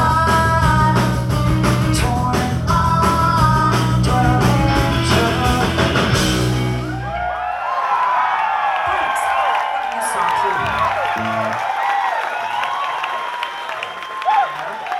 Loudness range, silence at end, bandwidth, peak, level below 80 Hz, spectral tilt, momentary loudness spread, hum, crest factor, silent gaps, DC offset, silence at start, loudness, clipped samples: 5 LU; 0 s; 15.5 kHz; -2 dBFS; -30 dBFS; -5.5 dB/octave; 8 LU; none; 16 dB; none; under 0.1%; 0 s; -17 LUFS; under 0.1%